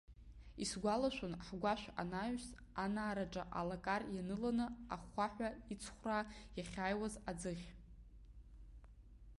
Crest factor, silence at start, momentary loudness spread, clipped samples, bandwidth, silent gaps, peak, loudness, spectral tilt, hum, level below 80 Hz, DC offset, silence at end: 18 dB; 0.1 s; 22 LU; under 0.1%; 11.5 kHz; none; -26 dBFS; -43 LUFS; -5 dB/octave; none; -60 dBFS; under 0.1%; 0 s